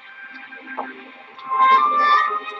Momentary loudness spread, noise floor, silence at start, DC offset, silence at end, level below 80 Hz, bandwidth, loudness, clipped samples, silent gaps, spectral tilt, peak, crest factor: 23 LU; -39 dBFS; 0.05 s; under 0.1%; 0 s; -82 dBFS; 7 kHz; -16 LUFS; under 0.1%; none; -2 dB/octave; -4 dBFS; 16 dB